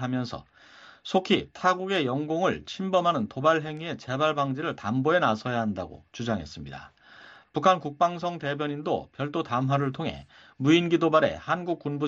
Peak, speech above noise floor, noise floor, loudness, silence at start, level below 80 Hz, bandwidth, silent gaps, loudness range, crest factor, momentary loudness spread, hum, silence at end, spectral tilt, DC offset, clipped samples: -8 dBFS; 25 dB; -51 dBFS; -27 LUFS; 0 s; -60 dBFS; 7.8 kHz; none; 3 LU; 20 dB; 13 LU; none; 0 s; -6 dB/octave; under 0.1%; under 0.1%